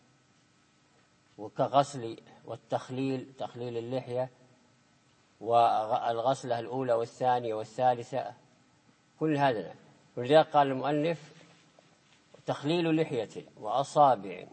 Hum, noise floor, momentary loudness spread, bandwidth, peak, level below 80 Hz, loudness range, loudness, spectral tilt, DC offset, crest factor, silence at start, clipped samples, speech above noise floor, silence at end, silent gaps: none; -66 dBFS; 17 LU; 8.8 kHz; -8 dBFS; -80 dBFS; 5 LU; -30 LUFS; -6 dB/octave; under 0.1%; 22 dB; 1.4 s; under 0.1%; 37 dB; 0.05 s; none